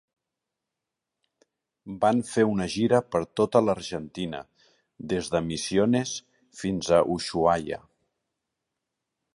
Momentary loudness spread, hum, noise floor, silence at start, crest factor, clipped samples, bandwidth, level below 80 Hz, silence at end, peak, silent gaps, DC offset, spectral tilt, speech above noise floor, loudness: 12 LU; none; -86 dBFS; 1.85 s; 22 dB; under 0.1%; 11.5 kHz; -56 dBFS; 1.55 s; -6 dBFS; none; under 0.1%; -5.5 dB/octave; 61 dB; -26 LUFS